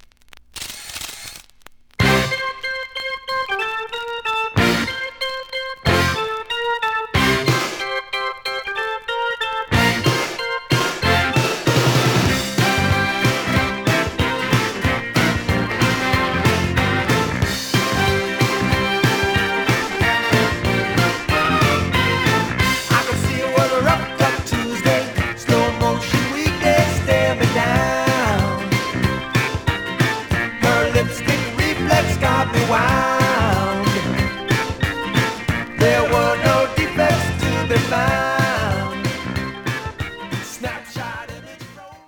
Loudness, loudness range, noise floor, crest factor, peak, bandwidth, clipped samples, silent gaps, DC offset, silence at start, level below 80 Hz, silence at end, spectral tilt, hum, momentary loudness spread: -18 LUFS; 4 LU; -47 dBFS; 18 dB; -2 dBFS; over 20 kHz; under 0.1%; none; under 0.1%; 0.35 s; -38 dBFS; 0.1 s; -4.5 dB/octave; none; 9 LU